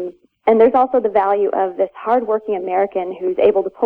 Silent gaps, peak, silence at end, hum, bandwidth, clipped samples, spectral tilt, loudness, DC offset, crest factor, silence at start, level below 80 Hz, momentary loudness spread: none; -2 dBFS; 0 s; none; 4.3 kHz; under 0.1%; -8.5 dB/octave; -17 LUFS; under 0.1%; 14 dB; 0 s; -56 dBFS; 9 LU